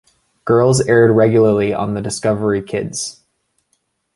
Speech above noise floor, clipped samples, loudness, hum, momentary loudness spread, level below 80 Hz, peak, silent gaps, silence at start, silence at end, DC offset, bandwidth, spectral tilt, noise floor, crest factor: 52 dB; under 0.1%; -15 LUFS; none; 12 LU; -48 dBFS; -2 dBFS; none; 0.45 s; 1.05 s; under 0.1%; 11.5 kHz; -6 dB/octave; -67 dBFS; 14 dB